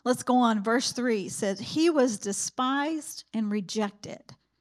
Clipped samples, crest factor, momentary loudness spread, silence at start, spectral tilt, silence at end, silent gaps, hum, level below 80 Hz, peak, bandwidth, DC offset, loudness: under 0.1%; 16 dB; 11 LU; 0.05 s; -3.5 dB/octave; 0.3 s; none; none; -74 dBFS; -12 dBFS; 15.5 kHz; under 0.1%; -27 LUFS